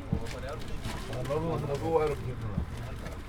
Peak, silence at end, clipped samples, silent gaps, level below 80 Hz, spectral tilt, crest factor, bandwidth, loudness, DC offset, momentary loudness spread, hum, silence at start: -12 dBFS; 0 s; under 0.1%; none; -42 dBFS; -6.5 dB/octave; 20 dB; 18.5 kHz; -34 LUFS; under 0.1%; 10 LU; none; 0 s